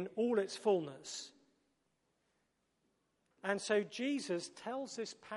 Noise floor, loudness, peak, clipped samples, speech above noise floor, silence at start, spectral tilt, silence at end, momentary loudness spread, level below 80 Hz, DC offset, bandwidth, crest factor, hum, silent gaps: -81 dBFS; -38 LUFS; -20 dBFS; under 0.1%; 43 dB; 0 s; -4 dB/octave; 0 s; 11 LU; -90 dBFS; under 0.1%; 11.5 kHz; 20 dB; none; none